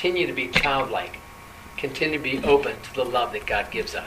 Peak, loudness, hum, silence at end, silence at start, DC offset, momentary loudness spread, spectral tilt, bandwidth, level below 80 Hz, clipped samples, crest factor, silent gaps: -2 dBFS; -24 LUFS; none; 0 s; 0 s; under 0.1%; 16 LU; -4.5 dB/octave; 15.5 kHz; -46 dBFS; under 0.1%; 24 dB; none